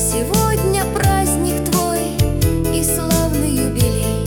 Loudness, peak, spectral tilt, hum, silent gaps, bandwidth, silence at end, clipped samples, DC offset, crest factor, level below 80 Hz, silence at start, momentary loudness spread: -17 LUFS; -2 dBFS; -5 dB/octave; none; none; 18 kHz; 0 s; under 0.1%; under 0.1%; 14 dB; -26 dBFS; 0 s; 2 LU